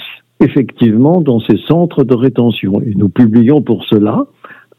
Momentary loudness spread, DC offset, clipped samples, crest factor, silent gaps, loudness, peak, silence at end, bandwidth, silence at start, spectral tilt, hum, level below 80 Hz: 6 LU; under 0.1%; 0.6%; 10 dB; none; -11 LUFS; 0 dBFS; 0.25 s; 13 kHz; 0 s; -10.5 dB/octave; none; -48 dBFS